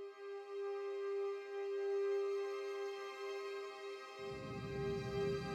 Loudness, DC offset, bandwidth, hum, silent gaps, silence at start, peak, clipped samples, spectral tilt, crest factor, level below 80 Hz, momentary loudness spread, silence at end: -43 LUFS; under 0.1%; 10 kHz; none; none; 0 s; -28 dBFS; under 0.1%; -6 dB/octave; 14 dB; -66 dBFS; 9 LU; 0 s